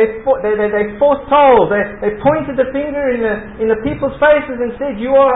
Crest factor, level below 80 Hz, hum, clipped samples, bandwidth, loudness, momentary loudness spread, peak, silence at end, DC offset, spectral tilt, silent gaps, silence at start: 14 dB; -40 dBFS; none; under 0.1%; 4 kHz; -14 LUFS; 9 LU; 0 dBFS; 0 s; under 0.1%; -11.5 dB/octave; none; 0 s